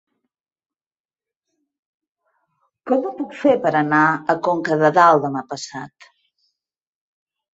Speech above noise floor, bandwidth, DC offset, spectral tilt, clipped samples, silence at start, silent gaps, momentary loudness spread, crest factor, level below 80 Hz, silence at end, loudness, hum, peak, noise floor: over 72 dB; 8 kHz; under 0.1%; -6 dB/octave; under 0.1%; 2.85 s; none; 18 LU; 20 dB; -68 dBFS; 1.7 s; -17 LUFS; none; -2 dBFS; under -90 dBFS